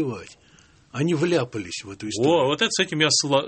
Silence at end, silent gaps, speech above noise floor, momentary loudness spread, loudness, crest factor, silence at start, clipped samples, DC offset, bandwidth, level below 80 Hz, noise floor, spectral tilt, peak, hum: 0 s; none; 32 dB; 14 LU; -22 LUFS; 18 dB; 0 s; under 0.1%; under 0.1%; 8.8 kHz; -62 dBFS; -55 dBFS; -3.5 dB/octave; -4 dBFS; none